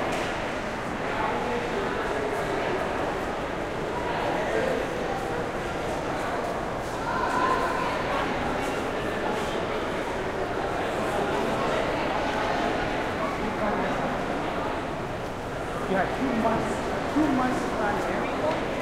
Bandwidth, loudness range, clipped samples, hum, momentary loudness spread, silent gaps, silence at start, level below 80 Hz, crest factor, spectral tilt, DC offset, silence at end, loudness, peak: 16 kHz; 2 LU; under 0.1%; none; 5 LU; none; 0 s; -44 dBFS; 16 dB; -5 dB/octave; under 0.1%; 0 s; -28 LUFS; -12 dBFS